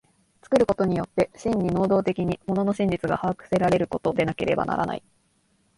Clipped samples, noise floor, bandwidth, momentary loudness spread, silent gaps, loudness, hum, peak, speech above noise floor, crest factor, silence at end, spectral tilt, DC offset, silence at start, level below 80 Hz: under 0.1%; -66 dBFS; 11.5 kHz; 5 LU; none; -24 LUFS; none; -6 dBFS; 43 dB; 18 dB; 0.8 s; -7.5 dB/octave; under 0.1%; 0.5 s; -50 dBFS